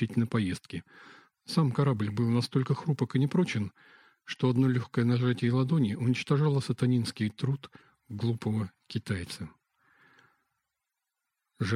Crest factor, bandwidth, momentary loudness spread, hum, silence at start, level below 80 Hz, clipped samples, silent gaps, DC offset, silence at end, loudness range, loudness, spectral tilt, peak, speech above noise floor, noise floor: 18 dB; 12 kHz; 12 LU; none; 0 s; -64 dBFS; under 0.1%; none; under 0.1%; 0 s; 9 LU; -29 LUFS; -7 dB/octave; -12 dBFS; 58 dB; -86 dBFS